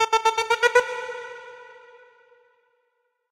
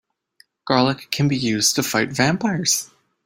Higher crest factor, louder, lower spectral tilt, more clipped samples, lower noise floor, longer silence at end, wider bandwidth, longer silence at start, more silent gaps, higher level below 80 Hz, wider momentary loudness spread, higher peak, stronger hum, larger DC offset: about the same, 20 dB vs 20 dB; second, -22 LUFS vs -19 LUFS; second, 0.5 dB/octave vs -3.5 dB/octave; neither; first, -73 dBFS vs -58 dBFS; first, 1.55 s vs 0.4 s; about the same, 16 kHz vs 16.5 kHz; second, 0 s vs 0.65 s; neither; second, -66 dBFS vs -56 dBFS; first, 23 LU vs 4 LU; second, -6 dBFS vs -2 dBFS; neither; neither